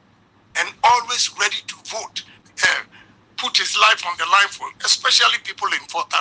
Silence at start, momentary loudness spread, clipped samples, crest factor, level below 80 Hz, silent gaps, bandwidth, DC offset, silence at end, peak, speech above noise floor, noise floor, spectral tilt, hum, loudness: 0.55 s; 15 LU; under 0.1%; 20 dB; -66 dBFS; none; 10.5 kHz; under 0.1%; 0 s; 0 dBFS; 36 dB; -55 dBFS; 1.5 dB/octave; none; -18 LUFS